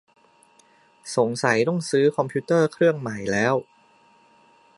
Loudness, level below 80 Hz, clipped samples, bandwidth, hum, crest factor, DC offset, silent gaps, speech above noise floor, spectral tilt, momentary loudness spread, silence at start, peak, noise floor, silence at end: -22 LUFS; -64 dBFS; under 0.1%; 11.5 kHz; none; 20 dB; under 0.1%; none; 36 dB; -5.5 dB/octave; 7 LU; 1.05 s; -4 dBFS; -57 dBFS; 1.15 s